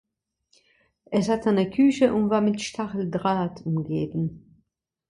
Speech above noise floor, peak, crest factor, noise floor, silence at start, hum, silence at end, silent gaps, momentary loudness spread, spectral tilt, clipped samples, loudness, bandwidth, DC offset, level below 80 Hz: 49 dB; -6 dBFS; 18 dB; -73 dBFS; 1.1 s; none; 0.7 s; none; 9 LU; -6.5 dB/octave; under 0.1%; -24 LUFS; 11 kHz; under 0.1%; -58 dBFS